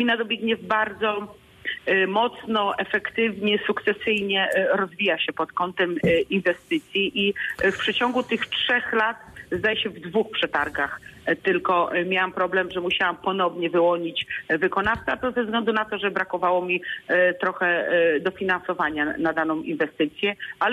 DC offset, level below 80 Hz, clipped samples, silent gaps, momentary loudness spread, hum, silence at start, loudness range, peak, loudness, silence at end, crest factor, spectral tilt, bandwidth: under 0.1%; -56 dBFS; under 0.1%; none; 5 LU; none; 0 s; 1 LU; -10 dBFS; -23 LUFS; 0 s; 14 dB; -5.5 dB/octave; 13.5 kHz